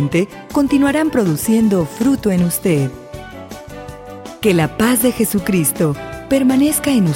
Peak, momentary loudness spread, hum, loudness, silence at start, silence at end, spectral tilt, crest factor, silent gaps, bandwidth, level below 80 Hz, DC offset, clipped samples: -2 dBFS; 18 LU; none; -16 LUFS; 0 s; 0 s; -5.5 dB/octave; 14 dB; none; 17 kHz; -42 dBFS; under 0.1%; under 0.1%